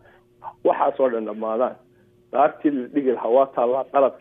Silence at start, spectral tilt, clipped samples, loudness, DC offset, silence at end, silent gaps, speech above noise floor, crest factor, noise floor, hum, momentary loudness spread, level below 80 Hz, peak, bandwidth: 0.45 s; -9 dB/octave; under 0.1%; -22 LUFS; under 0.1%; 0.05 s; none; 21 dB; 18 dB; -42 dBFS; 60 Hz at -60 dBFS; 7 LU; -70 dBFS; -4 dBFS; 3.8 kHz